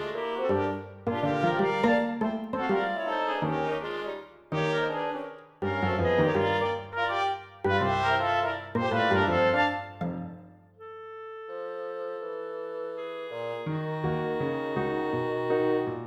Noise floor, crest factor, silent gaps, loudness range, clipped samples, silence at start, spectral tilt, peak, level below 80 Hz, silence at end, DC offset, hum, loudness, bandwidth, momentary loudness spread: -49 dBFS; 18 dB; none; 9 LU; under 0.1%; 0 s; -7 dB/octave; -10 dBFS; -60 dBFS; 0 s; under 0.1%; none; -28 LUFS; 10 kHz; 13 LU